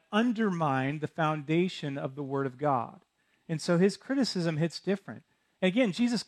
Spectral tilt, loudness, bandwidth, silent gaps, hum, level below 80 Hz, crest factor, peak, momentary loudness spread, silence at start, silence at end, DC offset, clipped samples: -6 dB/octave; -30 LUFS; 12 kHz; none; none; -76 dBFS; 16 dB; -14 dBFS; 9 LU; 0.1 s; 0.05 s; under 0.1%; under 0.1%